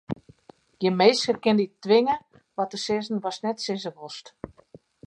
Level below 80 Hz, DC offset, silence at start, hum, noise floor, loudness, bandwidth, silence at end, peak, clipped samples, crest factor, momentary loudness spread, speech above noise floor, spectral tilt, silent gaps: -64 dBFS; under 0.1%; 0.1 s; none; -54 dBFS; -24 LUFS; 11 kHz; 0.6 s; -6 dBFS; under 0.1%; 20 dB; 20 LU; 30 dB; -5 dB/octave; none